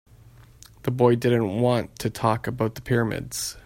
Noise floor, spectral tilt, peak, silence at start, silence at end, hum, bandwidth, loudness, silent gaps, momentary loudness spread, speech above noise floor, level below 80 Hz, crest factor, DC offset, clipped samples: -50 dBFS; -6 dB/octave; -4 dBFS; 0.85 s; 0.05 s; none; 16.5 kHz; -24 LUFS; none; 10 LU; 27 dB; -52 dBFS; 20 dB; under 0.1%; under 0.1%